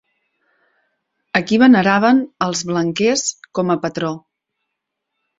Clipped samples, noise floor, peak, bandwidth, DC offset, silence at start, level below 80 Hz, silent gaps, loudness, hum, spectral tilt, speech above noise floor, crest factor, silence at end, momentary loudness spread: under 0.1%; -78 dBFS; -2 dBFS; 7.8 kHz; under 0.1%; 1.35 s; -60 dBFS; none; -16 LUFS; none; -4.5 dB/octave; 62 dB; 18 dB; 1.2 s; 11 LU